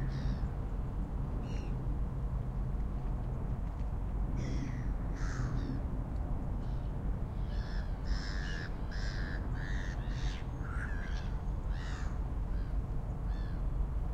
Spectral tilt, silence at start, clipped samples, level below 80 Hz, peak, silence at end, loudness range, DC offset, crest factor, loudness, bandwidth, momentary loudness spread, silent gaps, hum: -7 dB/octave; 0 s; under 0.1%; -36 dBFS; -22 dBFS; 0 s; 1 LU; under 0.1%; 14 dB; -39 LUFS; 7.6 kHz; 2 LU; none; none